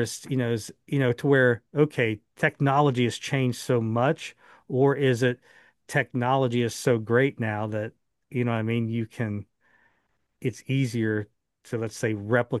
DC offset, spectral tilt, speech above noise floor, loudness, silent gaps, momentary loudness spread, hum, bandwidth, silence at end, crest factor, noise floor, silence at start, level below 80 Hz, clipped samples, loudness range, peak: under 0.1%; -6.5 dB/octave; 48 dB; -26 LUFS; none; 11 LU; none; 12.5 kHz; 0 s; 20 dB; -73 dBFS; 0 s; -68 dBFS; under 0.1%; 7 LU; -6 dBFS